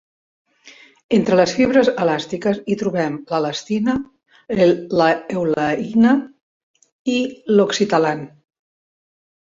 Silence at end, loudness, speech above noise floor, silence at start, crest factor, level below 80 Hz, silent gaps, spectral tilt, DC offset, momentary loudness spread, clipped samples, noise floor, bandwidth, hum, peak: 1.2 s; -18 LUFS; 30 dB; 0.65 s; 18 dB; -56 dBFS; 1.04-1.09 s, 6.43-6.74 s, 6.92-7.05 s; -5.5 dB/octave; under 0.1%; 8 LU; under 0.1%; -47 dBFS; 7.8 kHz; none; -2 dBFS